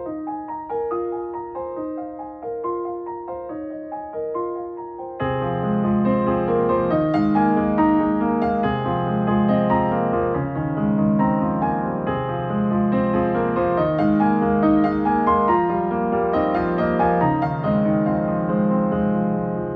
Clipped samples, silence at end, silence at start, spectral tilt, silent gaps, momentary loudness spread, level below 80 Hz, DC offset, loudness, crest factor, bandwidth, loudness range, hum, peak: under 0.1%; 0 s; 0 s; -11 dB/octave; none; 12 LU; -44 dBFS; under 0.1%; -21 LUFS; 16 dB; 4.8 kHz; 9 LU; none; -6 dBFS